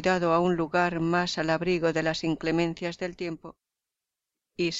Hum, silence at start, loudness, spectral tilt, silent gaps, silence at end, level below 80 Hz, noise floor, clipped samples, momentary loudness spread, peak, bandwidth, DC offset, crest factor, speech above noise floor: none; 0 s; -27 LUFS; -5.5 dB/octave; none; 0 s; -56 dBFS; -88 dBFS; under 0.1%; 11 LU; -12 dBFS; 8 kHz; under 0.1%; 16 dB; 61 dB